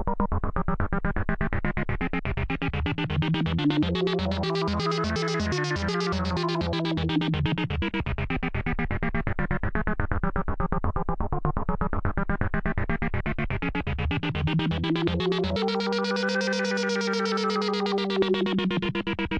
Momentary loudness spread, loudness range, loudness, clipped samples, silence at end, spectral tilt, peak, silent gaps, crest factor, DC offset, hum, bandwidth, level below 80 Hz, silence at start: 4 LU; 3 LU; -27 LUFS; under 0.1%; 0 s; -6 dB/octave; -8 dBFS; none; 18 dB; under 0.1%; none; 9.6 kHz; -36 dBFS; 0 s